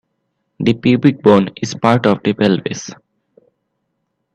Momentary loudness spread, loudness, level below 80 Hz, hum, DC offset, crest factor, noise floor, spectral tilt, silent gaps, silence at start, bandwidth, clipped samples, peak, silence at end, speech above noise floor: 11 LU; -14 LUFS; -54 dBFS; none; under 0.1%; 16 dB; -71 dBFS; -6.5 dB/octave; none; 0.6 s; 9.2 kHz; under 0.1%; 0 dBFS; 1.4 s; 57 dB